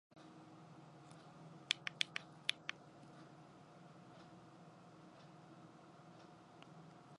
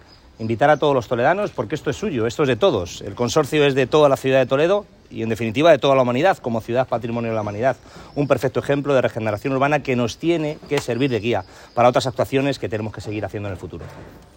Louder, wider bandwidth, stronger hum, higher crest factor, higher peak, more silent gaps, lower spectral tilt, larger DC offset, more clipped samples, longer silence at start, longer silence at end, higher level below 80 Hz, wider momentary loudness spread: second, -43 LUFS vs -20 LUFS; second, 11 kHz vs 16.5 kHz; first, 60 Hz at -75 dBFS vs none; first, 36 dB vs 18 dB; second, -16 dBFS vs -2 dBFS; neither; second, -2 dB/octave vs -6 dB/octave; neither; neither; second, 0.1 s vs 0.4 s; second, 0 s vs 0.2 s; second, -88 dBFS vs -50 dBFS; first, 19 LU vs 12 LU